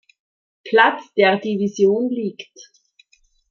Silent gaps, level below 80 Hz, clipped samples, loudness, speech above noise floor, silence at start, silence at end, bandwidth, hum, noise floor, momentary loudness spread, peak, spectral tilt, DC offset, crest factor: none; -70 dBFS; under 0.1%; -18 LUFS; 41 dB; 0.65 s; 0.9 s; 7 kHz; none; -59 dBFS; 14 LU; -2 dBFS; -5 dB/octave; under 0.1%; 18 dB